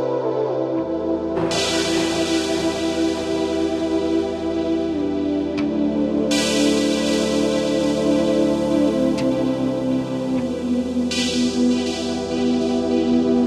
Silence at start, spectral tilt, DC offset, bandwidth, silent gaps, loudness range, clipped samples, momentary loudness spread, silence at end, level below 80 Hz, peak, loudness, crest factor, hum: 0 s; -4.5 dB/octave; under 0.1%; 13.5 kHz; none; 3 LU; under 0.1%; 4 LU; 0 s; -46 dBFS; -8 dBFS; -20 LUFS; 12 dB; none